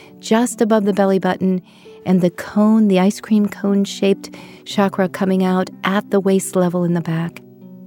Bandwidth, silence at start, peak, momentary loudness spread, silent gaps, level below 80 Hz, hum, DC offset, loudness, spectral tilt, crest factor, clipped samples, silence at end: 16.5 kHz; 0.25 s; 0 dBFS; 8 LU; none; -64 dBFS; none; under 0.1%; -17 LUFS; -6.5 dB/octave; 16 dB; under 0.1%; 0 s